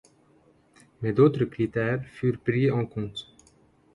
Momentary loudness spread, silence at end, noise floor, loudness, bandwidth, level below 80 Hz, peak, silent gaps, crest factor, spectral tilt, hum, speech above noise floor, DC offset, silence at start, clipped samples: 13 LU; 0.7 s; -61 dBFS; -26 LUFS; 11 kHz; -58 dBFS; -8 dBFS; none; 20 dB; -8.5 dB/octave; none; 36 dB; under 0.1%; 1 s; under 0.1%